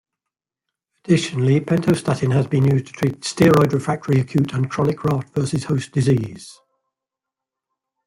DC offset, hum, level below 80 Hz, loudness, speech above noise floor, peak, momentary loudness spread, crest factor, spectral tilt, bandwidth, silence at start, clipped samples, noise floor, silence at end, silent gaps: under 0.1%; none; -52 dBFS; -19 LUFS; 67 dB; -2 dBFS; 7 LU; 18 dB; -7 dB/octave; 16 kHz; 1.05 s; under 0.1%; -86 dBFS; 1.55 s; none